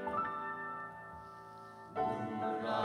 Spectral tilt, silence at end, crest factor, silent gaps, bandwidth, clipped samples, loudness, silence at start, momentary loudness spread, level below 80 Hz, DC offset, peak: -6.5 dB/octave; 0 s; 18 dB; none; 15.5 kHz; under 0.1%; -40 LUFS; 0 s; 14 LU; -72 dBFS; under 0.1%; -22 dBFS